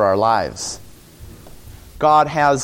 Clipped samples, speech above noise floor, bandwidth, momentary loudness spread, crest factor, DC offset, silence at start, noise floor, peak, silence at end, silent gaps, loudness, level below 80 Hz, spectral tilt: under 0.1%; 24 dB; 17 kHz; 14 LU; 16 dB; under 0.1%; 0 s; -40 dBFS; -2 dBFS; 0 s; none; -17 LUFS; -44 dBFS; -4 dB/octave